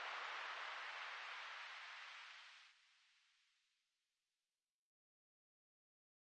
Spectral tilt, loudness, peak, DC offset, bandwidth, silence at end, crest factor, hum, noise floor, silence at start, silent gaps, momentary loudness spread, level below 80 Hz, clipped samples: 3 dB/octave; -50 LUFS; -38 dBFS; under 0.1%; 9.6 kHz; 3.1 s; 18 dB; none; under -90 dBFS; 0 s; none; 13 LU; under -90 dBFS; under 0.1%